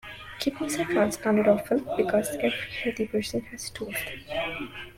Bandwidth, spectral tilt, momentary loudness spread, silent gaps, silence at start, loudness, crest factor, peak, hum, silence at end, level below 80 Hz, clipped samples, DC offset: 16.5 kHz; -4.5 dB/octave; 10 LU; none; 0.05 s; -27 LUFS; 20 dB; -8 dBFS; none; 0.05 s; -54 dBFS; under 0.1%; under 0.1%